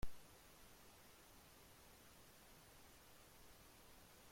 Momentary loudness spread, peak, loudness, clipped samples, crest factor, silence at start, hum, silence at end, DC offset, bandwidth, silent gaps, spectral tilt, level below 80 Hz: 0 LU; -32 dBFS; -64 LUFS; under 0.1%; 22 dB; 0 s; none; 0 s; under 0.1%; 16.5 kHz; none; -3.5 dB/octave; -64 dBFS